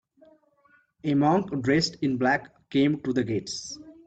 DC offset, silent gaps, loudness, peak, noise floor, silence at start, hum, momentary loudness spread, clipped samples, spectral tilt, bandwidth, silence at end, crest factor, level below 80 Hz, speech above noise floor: under 0.1%; none; -26 LUFS; -10 dBFS; -63 dBFS; 1.05 s; none; 11 LU; under 0.1%; -5.5 dB/octave; 8.8 kHz; 0.15 s; 16 dB; -60 dBFS; 38 dB